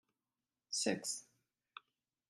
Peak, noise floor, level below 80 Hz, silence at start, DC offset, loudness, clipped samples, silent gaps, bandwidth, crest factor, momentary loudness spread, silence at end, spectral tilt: -22 dBFS; under -90 dBFS; -90 dBFS; 0.7 s; under 0.1%; -39 LUFS; under 0.1%; none; 15 kHz; 24 dB; 21 LU; 1.05 s; -2 dB/octave